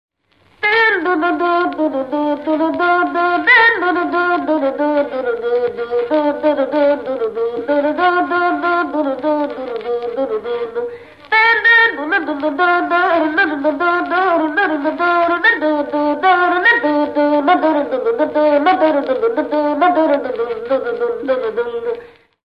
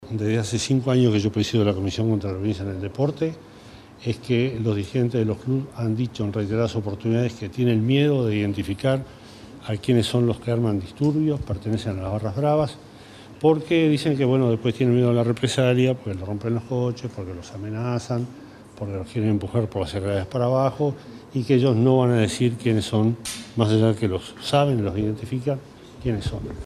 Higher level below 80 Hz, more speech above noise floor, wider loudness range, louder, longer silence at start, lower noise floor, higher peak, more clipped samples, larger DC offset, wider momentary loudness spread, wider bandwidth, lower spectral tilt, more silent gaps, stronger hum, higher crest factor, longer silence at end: second, -60 dBFS vs -50 dBFS; first, 39 dB vs 22 dB; about the same, 4 LU vs 5 LU; first, -15 LUFS vs -23 LUFS; first, 0.6 s vs 0 s; first, -55 dBFS vs -45 dBFS; about the same, -2 dBFS vs -4 dBFS; neither; first, 0.1% vs under 0.1%; about the same, 9 LU vs 11 LU; second, 6 kHz vs 13 kHz; second, -5.5 dB/octave vs -7 dB/octave; neither; neither; about the same, 14 dB vs 18 dB; first, 0.4 s vs 0 s